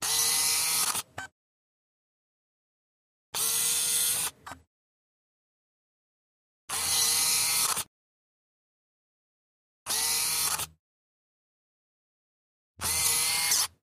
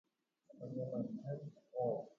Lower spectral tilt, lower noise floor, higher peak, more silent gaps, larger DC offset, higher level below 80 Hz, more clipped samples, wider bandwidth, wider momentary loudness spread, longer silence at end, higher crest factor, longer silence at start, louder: second, 1.5 dB/octave vs -11 dB/octave; first, under -90 dBFS vs -68 dBFS; first, -12 dBFS vs -28 dBFS; first, 1.32-3.33 s, 4.67-6.68 s, 7.87-9.86 s, 10.79-12.74 s vs none; neither; first, -64 dBFS vs -84 dBFS; neither; first, 15.5 kHz vs 7 kHz; first, 13 LU vs 8 LU; about the same, 0.15 s vs 0.05 s; about the same, 20 dB vs 16 dB; second, 0 s vs 0.5 s; first, -25 LUFS vs -44 LUFS